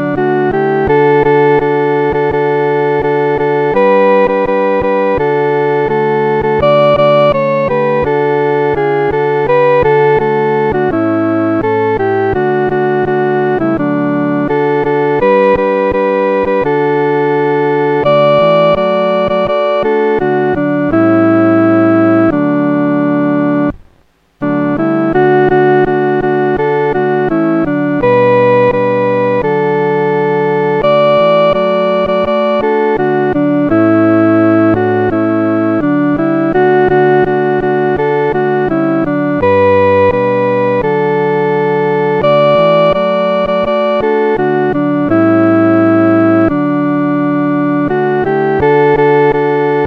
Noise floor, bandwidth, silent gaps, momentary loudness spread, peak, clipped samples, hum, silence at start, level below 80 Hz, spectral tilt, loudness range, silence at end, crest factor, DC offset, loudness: -51 dBFS; 6.2 kHz; none; 4 LU; 0 dBFS; under 0.1%; none; 0 s; -40 dBFS; -9 dB/octave; 2 LU; 0 s; 10 dB; 0.2%; -11 LUFS